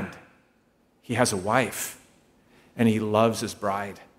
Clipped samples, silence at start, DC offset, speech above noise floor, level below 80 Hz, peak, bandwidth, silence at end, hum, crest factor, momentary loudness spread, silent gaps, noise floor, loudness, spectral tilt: under 0.1%; 0 s; under 0.1%; 40 dB; -64 dBFS; -4 dBFS; 16 kHz; 0.15 s; none; 24 dB; 11 LU; none; -64 dBFS; -25 LUFS; -4.5 dB/octave